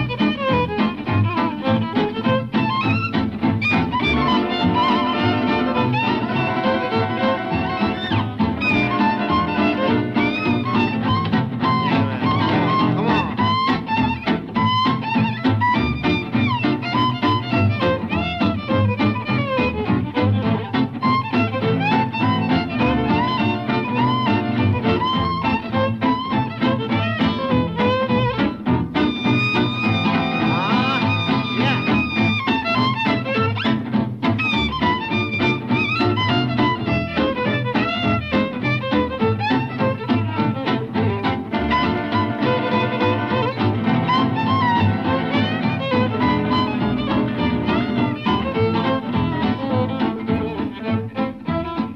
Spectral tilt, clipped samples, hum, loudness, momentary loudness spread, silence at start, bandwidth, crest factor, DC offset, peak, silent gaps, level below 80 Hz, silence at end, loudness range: -7.5 dB/octave; under 0.1%; none; -20 LUFS; 4 LU; 0 s; 6.6 kHz; 12 dB; under 0.1%; -8 dBFS; none; -42 dBFS; 0 s; 2 LU